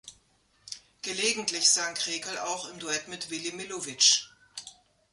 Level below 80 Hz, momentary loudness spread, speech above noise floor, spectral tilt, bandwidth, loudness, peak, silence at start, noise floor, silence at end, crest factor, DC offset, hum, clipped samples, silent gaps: -74 dBFS; 22 LU; 38 dB; 0.5 dB/octave; 11.5 kHz; -27 LUFS; -8 dBFS; 0.05 s; -67 dBFS; 0.4 s; 24 dB; under 0.1%; none; under 0.1%; none